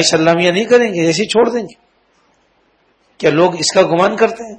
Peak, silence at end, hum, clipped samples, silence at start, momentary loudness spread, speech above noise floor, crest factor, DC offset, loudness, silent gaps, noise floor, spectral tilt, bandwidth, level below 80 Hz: 0 dBFS; 0 s; none; under 0.1%; 0 s; 5 LU; 44 dB; 14 dB; under 0.1%; -13 LUFS; none; -57 dBFS; -4 dB/octave; 9.6 kHz; -56 dBFS